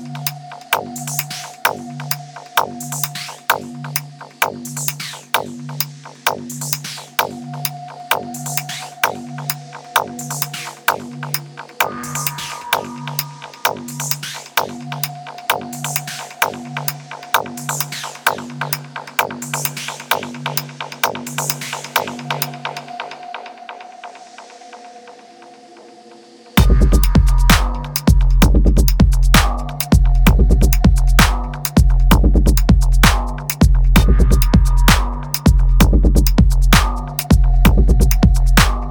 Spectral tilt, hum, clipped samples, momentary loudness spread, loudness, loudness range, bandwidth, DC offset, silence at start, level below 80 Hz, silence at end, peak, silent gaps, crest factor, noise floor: -4.5 dB/octave; none; under 0.1%; 13 LU; -18 LUFS; 8 LU; 20 kHz; under 0.1%; 0 s; -18 dBFS; 0 s; 0 dBFS; none; 16 dB; -42 dBFS